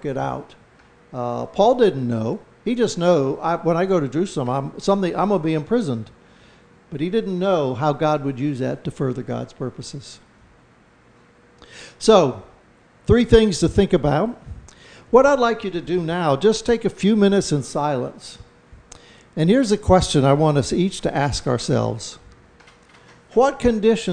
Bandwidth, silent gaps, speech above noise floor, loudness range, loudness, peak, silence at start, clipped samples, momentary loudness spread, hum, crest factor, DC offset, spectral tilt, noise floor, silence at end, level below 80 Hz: 10 kHz; none; 34 dB; 5 LU; -20 LUFS; 0 dBFS; 0.05 s; under 0.1%; 16 LU; none; 20 dB; under 0.1%; -6 dB/octave; -53 dBFS; 0 s; -40 dBFS